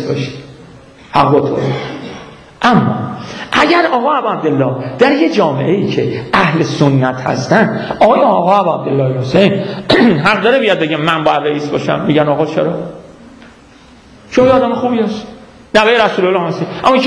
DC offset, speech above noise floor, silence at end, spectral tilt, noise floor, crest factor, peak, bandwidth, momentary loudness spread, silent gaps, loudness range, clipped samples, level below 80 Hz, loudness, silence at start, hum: under 0.1%; 29 dB; 0 s; -6.5 dB/octave; -41 dBFS; 12 dB; 0 dBFS; 11 kHz; 9 LU; none; 4 LU; under 0.1%; -46 dBFS; -12 LUFS; 0 s; none